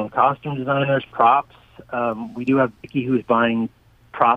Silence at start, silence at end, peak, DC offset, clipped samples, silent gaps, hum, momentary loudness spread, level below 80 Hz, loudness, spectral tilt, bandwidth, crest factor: 0 s; 0 s; 0 dBFS; under 0.1%; under 0.1%; none; none; 10 LU; -58 dBFS; -20 LUFS; -8.5 dB/octave; 5.4 kHz; 20 dB